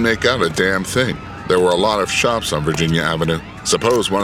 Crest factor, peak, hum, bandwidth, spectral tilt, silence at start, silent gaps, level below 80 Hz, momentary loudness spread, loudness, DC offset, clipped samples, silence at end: 16 dB; 0 dBFS; none; 16.5 kHz; -4 dB/octave; 0 s; none; -40 dBFS; 5 LU; -17 LUFS; under 0.1%; under 0.1%; 0 s